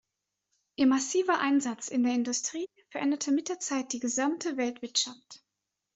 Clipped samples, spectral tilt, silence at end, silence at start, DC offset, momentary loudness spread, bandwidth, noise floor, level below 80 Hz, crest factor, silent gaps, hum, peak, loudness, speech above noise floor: under 0.1%; -1.5 dB/octave; 0.6 s; 0.8 s; under 0.1%; 9 LU; 8.2 kHz; -86 dBFS; -76 dBFS; 18 dB; none; none; -14 dBFS; -29 LUFS; 57 dB